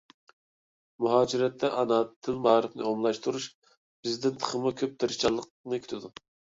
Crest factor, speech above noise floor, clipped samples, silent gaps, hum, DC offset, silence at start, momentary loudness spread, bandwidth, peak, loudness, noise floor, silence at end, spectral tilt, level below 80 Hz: 22 dB; over 62 dB; under 0.1%; 2.16-2.22 s, 3.55-3.62 s, 3.77-4.03 s, 5.50-5.64 s; none; under 0.1%; 1 s; 12 LU; 7.8 kHz; -8 dBFS; -29 LUFS; under -90 dBFS; 0.5 s; -4.5 dB/octave; -66 dBFS